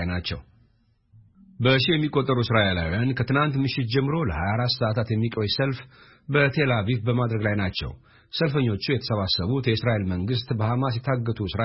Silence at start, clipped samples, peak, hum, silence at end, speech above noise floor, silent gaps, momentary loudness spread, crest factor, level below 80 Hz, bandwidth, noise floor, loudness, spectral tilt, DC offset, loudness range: 0 s; under 0.1%; -6 dBFS; none; 0 s; 40 dB; none; 7 LU; 18 dB; -46 dBFS; 5.8 kHz; -63 dBFS; -24 LUFS; -10 dB/octave; under 0.1%; 2 LU